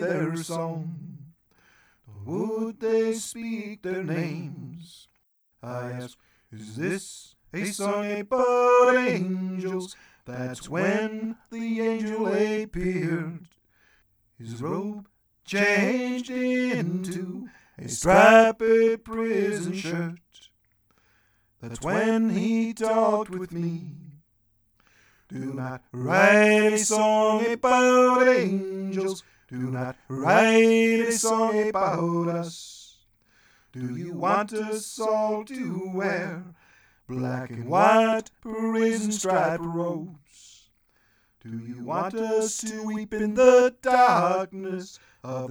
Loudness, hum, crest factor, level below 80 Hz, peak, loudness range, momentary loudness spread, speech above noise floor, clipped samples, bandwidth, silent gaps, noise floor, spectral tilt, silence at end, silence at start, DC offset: -24 LUFS; none; 22 dB; -58 dBFS; -2 dBFS; 10 LU; 19 LU; 45 dB; under 0.1%; over 20 kHz; none; -69 dBFS; -5 dB/octave; 0 s; 0 s; under 0.1%